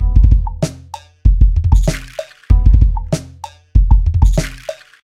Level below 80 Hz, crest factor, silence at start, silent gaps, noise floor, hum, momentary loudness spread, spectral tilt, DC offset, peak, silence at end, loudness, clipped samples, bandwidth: -14 dBFS; 12 dB; 0 s; none; -34 dBFS; none; 18 LU; -6.5 dB/octave; under 0.1%; 0 dBFS; 0.3 s; -15 LUFS; 0.1%; 11 kHz